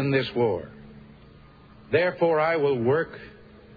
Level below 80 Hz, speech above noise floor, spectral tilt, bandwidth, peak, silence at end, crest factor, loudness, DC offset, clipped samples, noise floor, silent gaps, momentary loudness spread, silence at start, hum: -58 dBFS; 27 dB; -9 dB/octave; 5 kHz; -8 dBFS; 0.45 s; 18 dB; -24 LUFS; under 0.1%; under 0.1%; -50 dBFS; none; 12 LU; 0 s; none